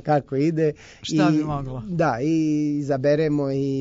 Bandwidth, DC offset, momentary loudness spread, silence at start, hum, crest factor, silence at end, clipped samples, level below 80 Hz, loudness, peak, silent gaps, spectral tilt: 7.8 kHz; under 0.1%; 7 LU; 0.05 s; none; 14 dB; 0 s; under 0.1%; -50 dBFS; -22 LUFS; -8 dBFS; none; -7 dB/octave